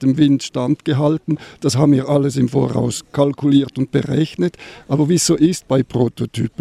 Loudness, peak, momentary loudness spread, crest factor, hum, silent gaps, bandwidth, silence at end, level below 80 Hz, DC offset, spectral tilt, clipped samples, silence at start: -17 LUFS; -2 dBFS; 8 LU; 14 dB; none; none; 14.5 kHz; 0.1 s; -50 dBFS; under 0.1%; -6 dB/octave; under 0.1%; 0 s